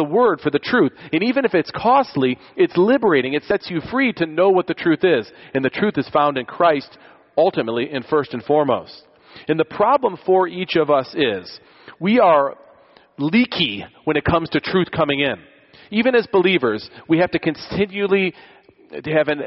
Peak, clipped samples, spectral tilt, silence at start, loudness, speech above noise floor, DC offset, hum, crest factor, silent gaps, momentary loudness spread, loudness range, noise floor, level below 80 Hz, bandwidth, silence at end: -4 dBFS; under 0.1%; -4 dB/octave; 0 s; -19 LUFS; 32 dB; under 0.1%; none; 16 dB; none; 8 LU; 2 LU; -50 dBFS; -52 dBFS; 6 kHz; 0 s